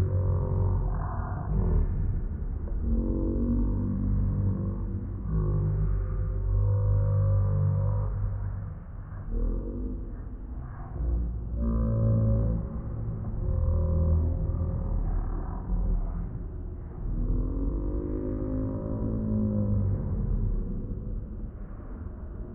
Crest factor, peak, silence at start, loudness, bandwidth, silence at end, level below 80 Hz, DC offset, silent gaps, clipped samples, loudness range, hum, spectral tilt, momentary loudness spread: 12 dB; -14 dBFS; 0 s; -30 LUFS; 2.1 kHz; 0 s; -30 dBFS; under 0.1%; none; under 0.1%; 5 LU; none; -14.5 dB/octave; 13 LU